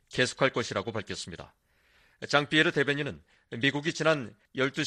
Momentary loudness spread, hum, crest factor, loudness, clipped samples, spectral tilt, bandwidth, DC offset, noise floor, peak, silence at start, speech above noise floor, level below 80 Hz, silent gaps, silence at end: 17 LU; none; 24 dB; -28 LUFS; under 0.1%; -4 dB/octave; 11.5 kHz; under 0.1%; -65 dBFS; -6 dBFS; 0.1 s; 36 dB; -64 dBFS; none; 0 s